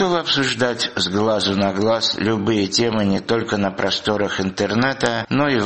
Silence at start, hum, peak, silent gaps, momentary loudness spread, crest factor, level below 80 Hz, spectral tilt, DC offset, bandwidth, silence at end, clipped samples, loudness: 0 s; none; -2 dBFS; none; 3 LU; 18 dB; -50 dBFS; -4.5 dB/octave; 0.2%; 8.8 kHz; 0 s; under 0.1%; -19 LUFS